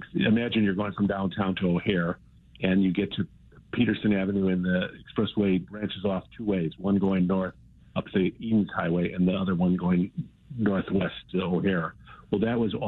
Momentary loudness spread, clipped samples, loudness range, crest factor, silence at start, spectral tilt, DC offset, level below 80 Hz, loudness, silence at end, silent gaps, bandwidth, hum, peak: 8 LU; under 0.1%; 1 LU; 14 dB; 0 s; -10 dB/octave; under 0.1%; -54 dBFS; -27 LUFS; 0 s; none; 4.1 kHz; none; -12 dBFS